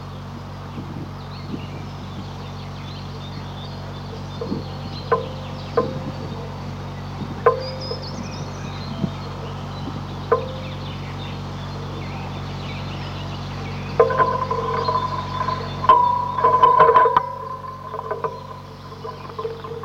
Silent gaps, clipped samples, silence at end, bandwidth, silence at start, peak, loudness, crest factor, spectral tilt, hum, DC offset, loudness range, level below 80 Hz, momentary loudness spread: none; under 0.1%; 0 s; 15.5 kHz; 0 s; -2 dBFS; -23 LUFS; 20 dB; -6.5 dB/octave; none; under 0.1%; 14 LU; -44 dBFS; 17 LU